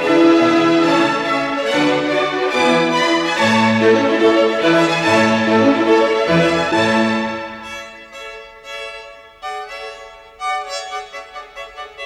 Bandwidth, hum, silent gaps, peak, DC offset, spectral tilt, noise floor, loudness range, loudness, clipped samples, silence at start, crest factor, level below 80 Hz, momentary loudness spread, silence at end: 12 kHz; none; none; -2 dBFS; under 0.1%; -5 dB/octave; -37 dBFS; 14 LU; -15 LUFS; under 0.1%; 0 s; 14 dB; -54 dBFS; 19 LU; 0 s